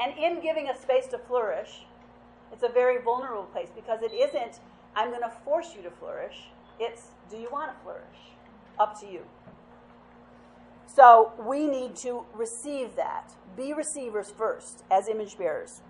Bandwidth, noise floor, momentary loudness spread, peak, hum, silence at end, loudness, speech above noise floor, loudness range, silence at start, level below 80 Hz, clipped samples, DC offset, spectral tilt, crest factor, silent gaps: 11.5 kHz; -53 dBFS; 17 LU; -2 dBFS; none; 0.1 s; -26 LUFS; 26 dB; 13 LU; 0 s; -66 dBFS; under 0.1%; under 0.1%; -3 dB/octave; 24 dB; none